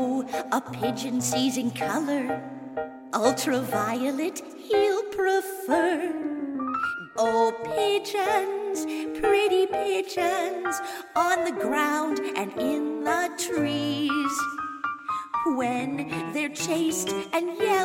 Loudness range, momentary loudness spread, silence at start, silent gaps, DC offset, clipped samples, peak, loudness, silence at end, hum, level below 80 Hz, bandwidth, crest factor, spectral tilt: 3 LU; 7 LU; 0 s; none; under 0.1%; under 0.1%; -8 dBFS; -26 LUFS; 0 s; none; -64 dBFS; 16.5 kHz; 18 dB; -3.5 dB/octave